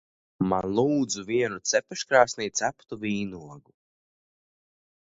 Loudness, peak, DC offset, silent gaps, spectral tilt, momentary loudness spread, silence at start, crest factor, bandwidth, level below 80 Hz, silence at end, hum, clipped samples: -26 LUFS; -4 dBFS; under 0.1%; none; -4 dB/octave; 10 LU; 0.4 s; 24 dB; 8 kHz; -60 dBFS; 1.45 s; none; under 0.1%